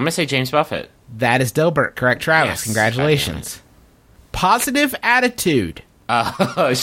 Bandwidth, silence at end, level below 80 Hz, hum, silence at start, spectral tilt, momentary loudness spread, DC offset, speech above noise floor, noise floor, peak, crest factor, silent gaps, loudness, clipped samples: 16.5 kHz; 0 s; -44 dBFS; none; 0 s; -4 dB/octave; 13 LU; under 0.1%; 32 dB; -50 dBFS; 0 dBFS; 18 dB; none; -17 LUFS; under 0.1%